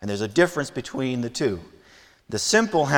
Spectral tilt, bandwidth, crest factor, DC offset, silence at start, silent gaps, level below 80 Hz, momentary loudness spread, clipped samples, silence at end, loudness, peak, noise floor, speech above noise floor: -4 dB/octave; 18.5 kHz; 22 dB; under 0.1%; 0 s; none; -56 dBFS; 10 LU; under 0.1%; 0 s; -23 LUFS; -2 dBFS; -53 dBFS; 30 dB